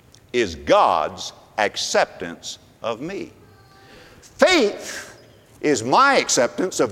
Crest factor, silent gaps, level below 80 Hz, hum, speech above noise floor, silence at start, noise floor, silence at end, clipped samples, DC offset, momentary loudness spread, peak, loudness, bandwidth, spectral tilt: 22 dB; none; -54 dBFS; none; 29 dB; 0.35 s; -49 dBFS; 0 s; under 0.1%; under 0.1%; 18 LU; 0 dBFS; -19 LUFS; 16.5 kHz; -2.5 dB/octave